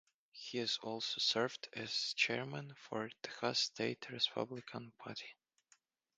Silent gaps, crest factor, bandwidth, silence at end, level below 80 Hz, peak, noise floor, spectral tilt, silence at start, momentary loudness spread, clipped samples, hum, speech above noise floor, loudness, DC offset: none; 24 dB; 9.6 kHz; 0.85 s; -86 dBFS; -18 dBFS; -74 dBFS; -3 dB/octave; 0.35 s; 15 LU; under 0.1%; none; 34 dB; -39 LUFS; under 0.1%